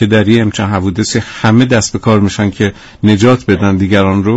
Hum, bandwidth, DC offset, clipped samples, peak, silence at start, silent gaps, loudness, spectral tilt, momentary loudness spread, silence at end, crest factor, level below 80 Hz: none; 8.2 kHz; under 0.1%; under 0.1%; 0 dBFS; 0 s; none; -11 LUFS; -6 dB/octave; 6 LU; 0 s; 10 dB; -40 dBFS